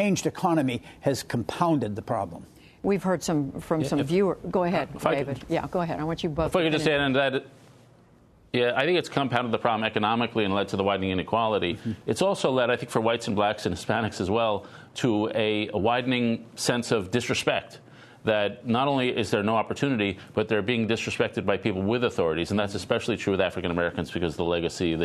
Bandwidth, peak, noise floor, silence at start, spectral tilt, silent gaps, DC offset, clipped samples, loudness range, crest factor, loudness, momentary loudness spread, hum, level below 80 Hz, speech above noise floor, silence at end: 13.5 kHz; -4 dBFS; -56 dBFS; 0 s; -5.5 dB/octave; none; under 0.1%; under 0.1%; 1 LU; 22 dB; -26 LUFS; 6 LU; none; -54 dBFS; 31 dB; 0 s